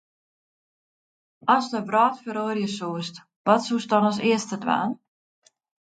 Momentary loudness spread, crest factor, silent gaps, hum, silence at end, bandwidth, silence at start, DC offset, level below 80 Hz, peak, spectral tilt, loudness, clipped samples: 9 LU; 22 dB; 3.36-3.45 s; none; 0.95 s; 9.2 kHz; 1.45 s; under 0.1%; -74 dBFS; -4 dBFS; -5 dB/octave; -24 LUFS; under 0.1%